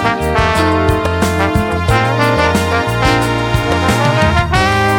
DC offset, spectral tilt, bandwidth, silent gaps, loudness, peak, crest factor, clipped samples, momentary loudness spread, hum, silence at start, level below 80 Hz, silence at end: under 0.1%; -5.5 dB/octave; 18 kHz; none; -13 LUFS; 0 dBFS; 12 dB; under 0.1%; 3 LU; none; 0 s; -24 dBFS; 0 s